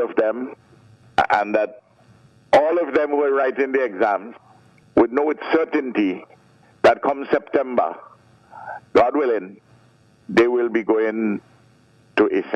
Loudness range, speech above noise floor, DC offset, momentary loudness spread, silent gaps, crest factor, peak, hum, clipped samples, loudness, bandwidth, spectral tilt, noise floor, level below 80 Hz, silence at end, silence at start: 2 LU; 35 dB; under 0.1%; 12 LU; none; 16 dB; -6 dBFS; none; under 0.1%; -20 LUFS; 9.6 kHz; -6 dB/octave; -54 dBFS; -58 dBFS; 0 s; 0 s